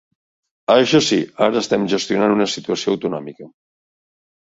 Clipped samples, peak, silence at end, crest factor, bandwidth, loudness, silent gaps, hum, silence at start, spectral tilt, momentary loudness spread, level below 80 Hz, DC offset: under 0.1%; -2 dBFS; 1.05 s; 18 dB; 8 kHz; -17 LUFS; none; none; 0.7 s; -4.5 dB/octave; 12 LU; -60 dBFS; under 0.1%